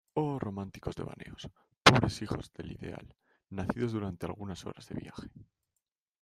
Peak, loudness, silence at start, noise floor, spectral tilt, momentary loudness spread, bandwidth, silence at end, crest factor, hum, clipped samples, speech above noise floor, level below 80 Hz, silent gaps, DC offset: -2 dBFS; -32 LUFS; 0.15 s; -87 dBFS; -5 dB/octave; 23 LU; 14.5 kHz; 0.8 s; 32 dB; none; under 0.1%; 52 dB; -56 dBFS; 1.77-1.81 s; under 0.1%